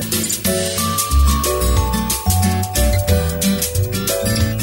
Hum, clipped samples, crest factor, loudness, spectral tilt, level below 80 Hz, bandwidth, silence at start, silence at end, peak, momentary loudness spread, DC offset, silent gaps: none; under 0.1%; 14 dB; -17 LUFS; -4 dB/octave; -22 dBFS; 16.5 kHz; 0 s; 0 s; -4 dBFS; 3 LU; under 0.1%; none